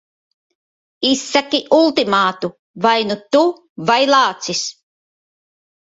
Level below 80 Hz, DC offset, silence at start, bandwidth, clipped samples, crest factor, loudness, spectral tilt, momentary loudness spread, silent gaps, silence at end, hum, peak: -62 dBFS; under 0.1%; 1 s; 8 kHz; under 0.1%; 18 dB; -16 LUFS; -3 dB/octave; 9 LU; 2.59-2.74 s, 3.69-3.76 s; 1.15 s; none; 0 dBFS